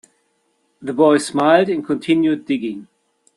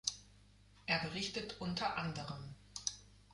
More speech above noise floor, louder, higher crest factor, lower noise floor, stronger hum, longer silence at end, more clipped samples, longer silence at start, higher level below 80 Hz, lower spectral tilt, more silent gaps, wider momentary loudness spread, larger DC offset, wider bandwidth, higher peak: first, 49 dB vs 23 dB; first, -17 LUFS vs -41 LUFS; second, 18 dB vs 26 dB; about the same, -65 dBFS vs -64 dBFS; second, none vs 50 Hz at -60 dBFS; first, 0.55 s vs 0 s; neither; first, 0.8 s vs 0.05 s; about the same, -64 dBFS vs -64 dBFS; first, -5.5 dB/octave vs -3 dB/octave; neither; about the same, 14 LU vs 13 LU; neither; about the same, 11.5 kHz vs 11.5 kHz; first, -2 dBFS vs -18 dBFS